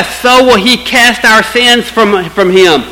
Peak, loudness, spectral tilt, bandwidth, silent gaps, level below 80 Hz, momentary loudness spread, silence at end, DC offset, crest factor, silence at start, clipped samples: 0 dBFS; -6 LUFS; -3 dB/octave; 19.5 kHz; none; -36 dBFS; 4 LU; 0 s; under 0.1%; 8 dB; 0 s; 3%